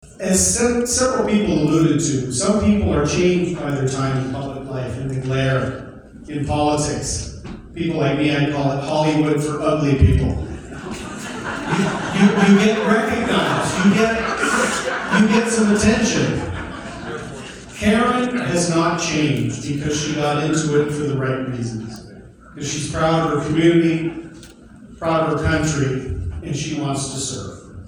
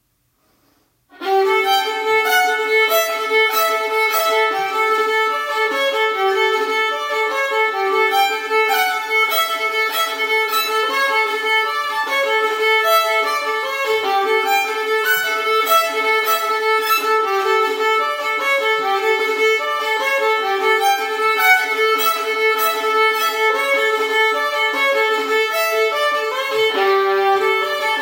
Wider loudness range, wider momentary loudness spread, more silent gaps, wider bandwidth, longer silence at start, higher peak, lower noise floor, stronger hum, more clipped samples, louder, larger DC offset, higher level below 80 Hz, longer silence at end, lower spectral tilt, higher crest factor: first, 5 LU vs 1 LU; first, 14 LU vs 3 LU; neither; about the same, 15.5 kHz vs 16.5 kHz; second, 0.05 s vs 1.15 s; about the same, 0 dBFS vs 0 dBFS; second, -41 dBFS vs -63 dBFS; neither; neither; second, -19 LUFS vs -16 LUFS; neither; first, -36 dBFS vs -74 dBFS; about the same, 0 s vs 0 s; first, -5 dB/octave vs 0.5 dB/octave; about the same, 18 dB vs 16 dB